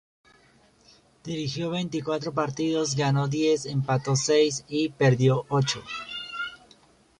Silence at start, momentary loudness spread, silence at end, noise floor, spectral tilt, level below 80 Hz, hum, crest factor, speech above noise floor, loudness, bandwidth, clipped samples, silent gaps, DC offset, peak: 1.25 s; 12 LU; 0.65 s; -59 dBFS; -5 dB/octave; -62 dBFS; none; 18 dB; 35 dB; -26 LUFS; 10.5 kHz; under 0.1%; none; under 0.1%; -8 dBFS